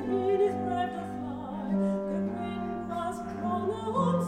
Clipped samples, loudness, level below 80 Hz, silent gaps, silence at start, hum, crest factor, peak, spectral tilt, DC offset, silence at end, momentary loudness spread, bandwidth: under 0.1%; -31 LUFS; -58 dBFS; none; 0 s; none; 14 dB; -16 dBFS; -8 dB/octave; under 0.1%; 0 s; 9 LU; 12.5 kHz